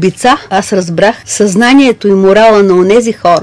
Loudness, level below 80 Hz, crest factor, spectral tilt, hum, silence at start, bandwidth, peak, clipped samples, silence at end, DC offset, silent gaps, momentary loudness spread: -7 LUFS; -42 dBFS; 8 dB; -5 dB/octave; none; 0 s; 11 kHz; 0 dBFS; 3%; 0 s; under 0.1%; none; 6 LU